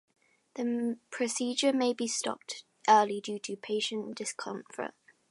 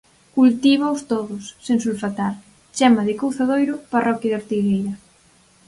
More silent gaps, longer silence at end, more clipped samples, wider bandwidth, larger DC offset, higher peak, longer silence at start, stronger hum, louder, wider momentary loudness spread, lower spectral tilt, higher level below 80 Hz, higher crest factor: neither; second, 0.4 s vs 0.7 s; neither; about the same, 11.5 kHz vs 11.5 kHz; neither; second, -10 dBFS vs -2 dBFS; first, 0.55 s vs 0.35 s; neither; second, -31 LUFS vs -20 LUFS; about the same, 16 LU vs 14 LU; second, -2.5 dB/octave vs -5.5 dB/octave; second, -86 dBFS vs -60 dBFS; about the same, 22 dB vs 18 dB